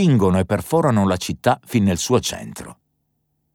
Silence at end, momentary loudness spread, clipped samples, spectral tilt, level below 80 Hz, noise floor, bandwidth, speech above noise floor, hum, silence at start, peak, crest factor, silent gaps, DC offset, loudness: 0.8 s; 16 LU; under 0.1%; -6 dB/octave; -48 dBFS; -70 dBFS; 18 kHz; 52 dB; none; 0 s; -2 dBFS; 16 dB; none; under 0.1%; -19 LUFS